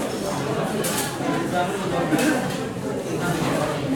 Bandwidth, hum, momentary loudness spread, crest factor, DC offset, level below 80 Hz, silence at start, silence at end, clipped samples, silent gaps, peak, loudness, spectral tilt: 17.5 kHz; none; 6 LU; 16 dB; under 0.1%; -50 dBFS; 0 s; 0 s; under 0.1%; none; -8 dBFS; -24 LUFS; -4.5 dB/octave